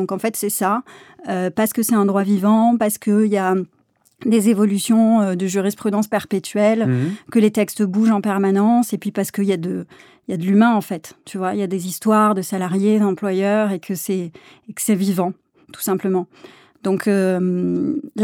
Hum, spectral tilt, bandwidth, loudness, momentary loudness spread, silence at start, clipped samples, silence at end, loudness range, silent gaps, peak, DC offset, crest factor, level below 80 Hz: none; -6 dB/octave; 17.5 kHz; -19 LUFS; 10 LU; 0 s; under 0.1%; 0 s; 4 LU; none; -4 dBFS; under 0.1%; 14 dB; -68 dBFS